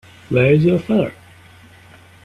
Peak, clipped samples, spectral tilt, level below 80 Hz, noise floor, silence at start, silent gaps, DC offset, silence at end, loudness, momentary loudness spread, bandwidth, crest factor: -2 dBFS; under 0.1%; -8.5 dB/octave; -50 dBFS; -45 dBFS; 0.3 s; none; under 0.1%; 1.15 s; -16 LUFS; 8 LU; 11.5 kHz; 18 dB